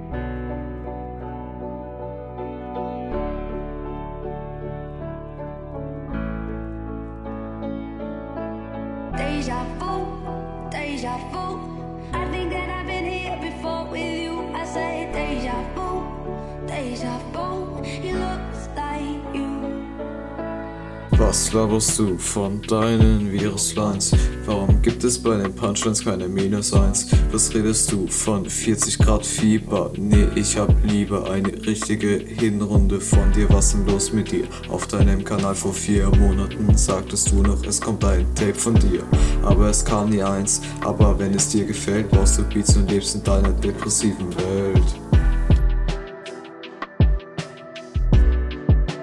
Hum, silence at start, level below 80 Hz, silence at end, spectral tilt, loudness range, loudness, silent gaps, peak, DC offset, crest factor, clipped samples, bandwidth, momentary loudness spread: none; 0 s; -26 dBFS; 0 s; -5 dB/octave; 12 LU; -22 LUFS; none; -2 dBFS; under 0.1%; 18 dB; under 0.1%; 12 kHz; 14 LU